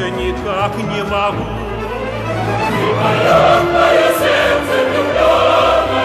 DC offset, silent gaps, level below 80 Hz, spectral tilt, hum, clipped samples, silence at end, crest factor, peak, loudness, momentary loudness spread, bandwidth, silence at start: under 0.1%; none; -34 dBFS; -5 dB/octave; none; under 0.1%; 0 s; 14 dB; 0 dBFS; -14 LUFS; 10 LU; 14 kHz; 0 s